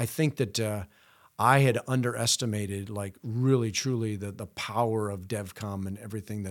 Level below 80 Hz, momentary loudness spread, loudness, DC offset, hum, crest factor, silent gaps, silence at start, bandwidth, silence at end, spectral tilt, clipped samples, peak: -64 dBFS; 13 LU; -29 LUFS; under 0.1%; none; 22 dB; none; 0 s; 18 kHz; 0 s; -5 dB/octave; under 0.1%; -6 dBFS